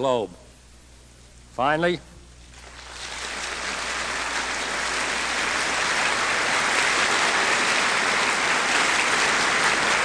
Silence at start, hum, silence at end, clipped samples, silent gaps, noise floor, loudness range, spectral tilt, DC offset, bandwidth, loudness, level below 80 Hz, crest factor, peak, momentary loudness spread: 0 s; none; 0 s; under 0.1%; none; -49 dBFS; 9 LU; -1 dB/octave; under 0.1%; 11 kHz; -22 LUFS; -50 dBFS; 20 dB; -6 dBFS; 12 LU